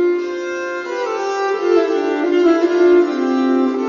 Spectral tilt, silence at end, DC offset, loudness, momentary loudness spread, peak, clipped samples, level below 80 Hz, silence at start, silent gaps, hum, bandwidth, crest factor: -4 dB/octave; 0 s; under 0.1%; -16 LUFS; 10 LU; -4 dBFS; under 0.1%; -62 dBFS; 0 s; none; none; 7.2 kHz; 12 dB